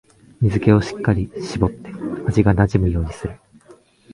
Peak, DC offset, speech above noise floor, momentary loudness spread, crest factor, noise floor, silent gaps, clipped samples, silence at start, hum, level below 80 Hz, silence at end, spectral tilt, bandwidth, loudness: 0 dBFS; under 0.1%; 31 dB; 13 LU; 20 dB; -49 dBFS; none; under 0.1%; 0.4 s; none; -32 dBFS; 0.8 s; -8 dB/octave; 11 kHz; -19 LUFS